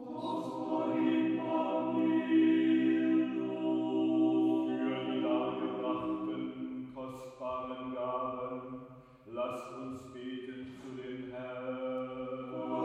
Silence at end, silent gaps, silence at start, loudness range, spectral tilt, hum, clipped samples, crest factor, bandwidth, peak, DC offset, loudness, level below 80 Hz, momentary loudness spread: 0 s; none; 0 s; 11 LU; -7.5 dB/octave; none; under 0.1%; 14 dB; 4.7 kHz; -18 dBFS; under 0.1%; -34 LUFS; -72 dBFS; 15 LU